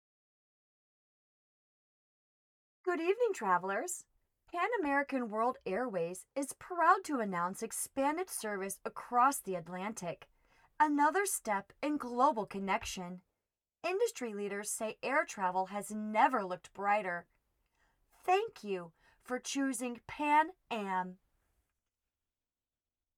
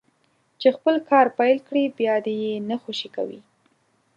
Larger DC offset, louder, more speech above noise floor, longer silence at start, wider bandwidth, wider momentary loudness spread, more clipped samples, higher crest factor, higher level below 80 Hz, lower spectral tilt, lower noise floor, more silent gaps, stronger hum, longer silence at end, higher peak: neither; second, -35 LUFS vs -22 LUFS; first, over 56 dB vs 45 dB; first, 2.85 s vs 0.6 s; first, 18.5 kHz vs 7.8 kHz; about the same, 12 LU vs 12 LU; neither; about the same, 22 dB vs 20 dB; about the same, -72 dBFS vs -76 dBFS; second, -3.5 dB/octave vs -5.5 dB/octave; first, under -90 dBFS vs -66 dBFS; neither; neither; first, 2.05 s vs 0.75 s; second, -14 dBFS vs -4 dBFS